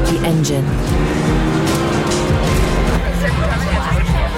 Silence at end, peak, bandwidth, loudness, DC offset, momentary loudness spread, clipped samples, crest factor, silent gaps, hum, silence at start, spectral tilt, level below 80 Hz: 0 s; -2 dBFS; 16.5 kHz; -16 LUFS; under 0.1%; 2 LU; under 0.1%; 12 dB; none; none; 0 s; -5.5 dB/octave; -20 dBFS